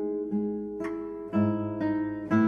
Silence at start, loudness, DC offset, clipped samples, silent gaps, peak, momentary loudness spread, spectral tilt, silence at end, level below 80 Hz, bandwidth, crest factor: 0 s; -30 LUFS; under 0.1%; under 0.1%; none; -14 dBFS; 7 LU; -9.5 dB/octave; 0 s; -62 dBFS; 6.6 kHz; 16 dB